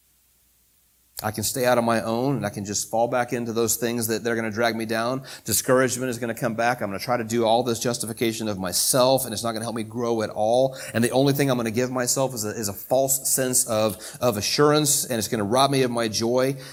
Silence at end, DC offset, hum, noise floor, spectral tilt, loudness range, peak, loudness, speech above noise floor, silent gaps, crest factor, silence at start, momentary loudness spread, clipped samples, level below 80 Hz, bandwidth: 0 s; under 0.1%; none; -62 dBFS; -3.5 dB/octave; 3 LU; -4 dBFS; -23 LUFS; 39 dB; none; 18 dB; 1.15 s; 8 LU; under 0.1%; -60 dBFS; 19 kHz